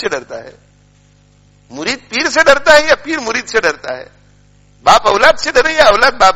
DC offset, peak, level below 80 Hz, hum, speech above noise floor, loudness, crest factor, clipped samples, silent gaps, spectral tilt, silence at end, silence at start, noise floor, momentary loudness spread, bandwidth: under 0.1%; 0 dBFS; -38 dBFS; 50 Hz at -50 dBFS; 37 dB; -11 LUFS; 12 dB; 0.8%; none; -2 dB/octave; 0 s; 0 s; -48 dBFS; 16 LU; 17 kHz